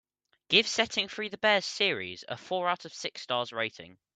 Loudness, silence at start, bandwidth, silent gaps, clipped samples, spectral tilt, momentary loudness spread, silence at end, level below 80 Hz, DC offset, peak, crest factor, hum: -29 LUFS; 0.5 s; 9.4 kHz; none; under 0.1%; -2 dB/octave; 12 LU; 0.25 s; -74 dBFS; under 0.1%; -8 dBFS; 24 dB; none